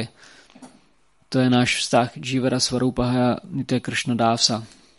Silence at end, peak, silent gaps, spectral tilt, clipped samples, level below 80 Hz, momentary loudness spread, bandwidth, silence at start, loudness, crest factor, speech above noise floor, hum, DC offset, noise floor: 0.35 s; -4 dBFS; none; -4.5 dB/octave; under 0.1%; -50 dBFS; 8 LU; 11.5 kHz; 0 s; -21 LUFS; 20 dB; 41 dB; none; under 0.1%; -62 dBFS